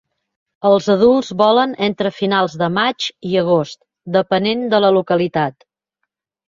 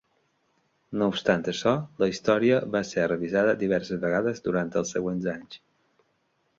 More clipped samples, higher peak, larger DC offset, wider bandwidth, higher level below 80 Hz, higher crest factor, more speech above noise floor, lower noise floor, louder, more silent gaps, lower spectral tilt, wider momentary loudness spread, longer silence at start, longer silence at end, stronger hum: neither; first, -2 dBFS vs -6 dBFS; neither; about the same, 7.6 kHz vs 7.8 kHz; about the same, -58 dBFS vs -60 dBFS; about the same, 16 dB vs 20 dB; first, 61 dB vs 46 dB; first, -76 dBFS vs -71 dBFS; first, -16 LUFS vs -26 LUFS; neither; about the same, -6 dB/octave vs -5.5 dB/octave; about the same, 7 LU vs 8 LU; second, 0.65 s vs 0.9 s; about the same, 1 s vs 1 s; neither